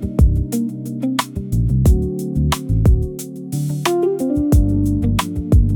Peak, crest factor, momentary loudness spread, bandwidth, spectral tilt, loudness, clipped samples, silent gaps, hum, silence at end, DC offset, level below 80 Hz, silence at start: -2 dBFS; 14 dB; 8 LU; 18 kHz; -7 dB/octave; -18 LUFS; under 0.1%; none; none; 0 s; under 0.1%; -22 dBFS; 0 s